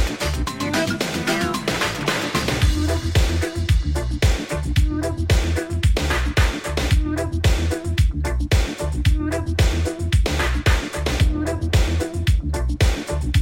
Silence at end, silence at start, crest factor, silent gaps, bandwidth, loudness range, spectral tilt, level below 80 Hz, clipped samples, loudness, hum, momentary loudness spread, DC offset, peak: 0 s; 0 s; 14 dB; none; 16.5 kHz; 0 LU; -5 dB/octave; -22 dBFS; under 0.1%; -21 LUFS; none; 4 LU; under 0.1%; -4 dBFS